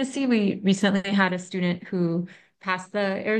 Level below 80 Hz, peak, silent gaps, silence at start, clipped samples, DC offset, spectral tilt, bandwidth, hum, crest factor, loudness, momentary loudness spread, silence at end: -70 dBFS; -6 dBFS; none; 0 s; under 0.1%; under 0.1%; -6 dB/octave; 9.6 kHz; none; 18 dB; -25 LUFS; 7 LU; 0 s